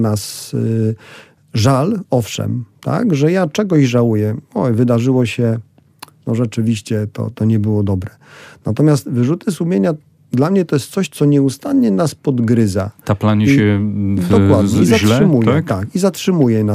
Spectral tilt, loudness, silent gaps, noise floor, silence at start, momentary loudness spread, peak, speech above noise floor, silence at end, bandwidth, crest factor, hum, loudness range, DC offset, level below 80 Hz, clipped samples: -7 dB/octave; -15 LUFS; none; -41 dBFS; 0 s; 9 LU; -2 dBFS; 27 dB; 0 s; 15.5 kHz; 14 dB; none; 5 LU; under 0.1%; -50 dBFS; under 0.1%